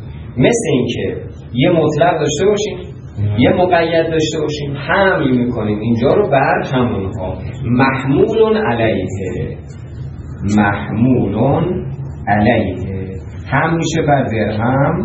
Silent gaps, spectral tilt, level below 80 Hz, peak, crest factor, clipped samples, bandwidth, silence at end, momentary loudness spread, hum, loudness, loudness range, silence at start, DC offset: none; -6.5 dB/octave; -38 dBFS; 0 dBFS; 14 dB; under 0.1%; 10 kHz; 0 s; 12 LU; none; -15 LUFS; 2 LU; 0 s; under 0.1%